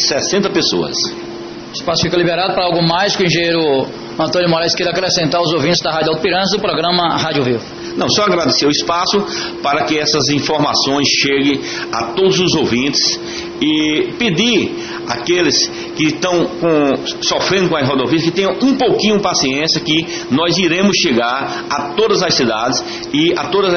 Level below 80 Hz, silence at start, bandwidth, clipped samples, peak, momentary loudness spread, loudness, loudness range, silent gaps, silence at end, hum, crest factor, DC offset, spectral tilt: -46 dBFS; 0 s; 6.8 kHz; under 0.1%; -2 dBFS; 7 LU; -14 LUFS; 1 LU; none; 0 s; none; 12 dB; under 0.1%; -3.5 dB/octave